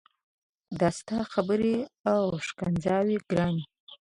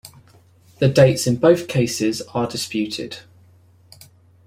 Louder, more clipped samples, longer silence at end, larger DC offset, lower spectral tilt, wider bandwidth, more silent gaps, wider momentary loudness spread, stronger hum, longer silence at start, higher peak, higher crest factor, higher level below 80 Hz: second, -28 LUFS vs -19 LUFS; neither; second, 0.2 s vs 1.25 s; neither; about the same, -6.5 dB/octave vs -5.5 dB/octave; second, 11.5 kHz vs 16 kHz; first, 2.00-2.04 s, 3.80-3.87 s vs none; second, 6 LU vs 13 LU; neither; first, 0.7 s vs 0.05 s; second, -12 dBFS vs -2 dBFS; about the same, 18 dB vs 18 dB; second, -58 dBFS vs -52 dBFS